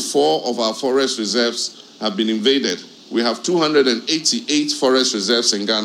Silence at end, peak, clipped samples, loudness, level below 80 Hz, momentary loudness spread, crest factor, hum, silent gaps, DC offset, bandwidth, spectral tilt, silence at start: 0 s; -2 dBFS; under 0.1%; -18 LUFS; -78 dBFS; 8 LU; 16 dB; none; none; under 0.1%; 16 kHz; -2.5 dB/octave; 0 s